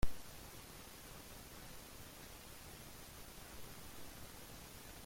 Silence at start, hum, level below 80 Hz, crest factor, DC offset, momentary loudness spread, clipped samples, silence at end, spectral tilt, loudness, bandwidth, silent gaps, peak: 0 s; none; -54 dBFS; 22 dB; under 0.1%; 1 LU; under 0.1%; 0 s; -3.5 dB/octave; -53 LUFS; 16.5 kHz; none; -22 dBFS